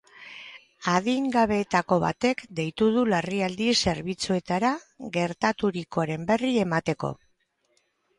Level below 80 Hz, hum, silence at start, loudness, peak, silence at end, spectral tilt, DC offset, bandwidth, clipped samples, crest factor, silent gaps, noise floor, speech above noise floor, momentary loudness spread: -56 dBFS; none; 0.2 s; -26 LUFS; -8 dBFS; 1.05 s; -5 dB/octave; under 0.1%; 11.5 kHz; under 0.1%; 18 dB; none; -70 dBFS; 45 dB; 11 LU